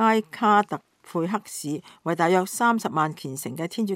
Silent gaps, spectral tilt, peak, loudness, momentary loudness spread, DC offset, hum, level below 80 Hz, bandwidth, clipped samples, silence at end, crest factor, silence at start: none; -5 dB/octave; -6 dBFS; -25 LUFS; 12 LU; under 0.1%; none; -78 dBFS; 16 kHz; under 0.1%; 0 s; 18 dB; 0 s